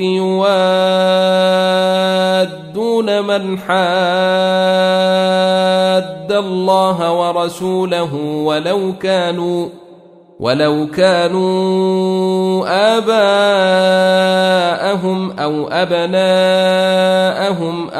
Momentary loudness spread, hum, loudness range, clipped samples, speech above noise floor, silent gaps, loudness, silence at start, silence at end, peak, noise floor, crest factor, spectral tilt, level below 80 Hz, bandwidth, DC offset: 6 LU; none; 3 LU; under 0.1%; 28 dB; none; -14 LUFS; 0 s; 0 s; 0 dBFS; -41 dBFS; 12 dB; -5.5 dB/octave; -60 dBFS; 14 kHz; under 0.1%